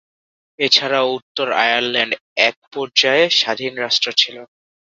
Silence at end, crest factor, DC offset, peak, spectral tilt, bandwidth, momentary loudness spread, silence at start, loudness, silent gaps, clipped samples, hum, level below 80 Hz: 0.4 s; 18 dB; under 0.1%; 0 dBFS; -1.5 dB/octave; 7.8 kHz; 7 LU; 0.6 s; -16 LUFS; 1.22-1.35 s, 2.21-2.36 s, 2.57-2.71 s; under 0.1%; none; -68 dBFS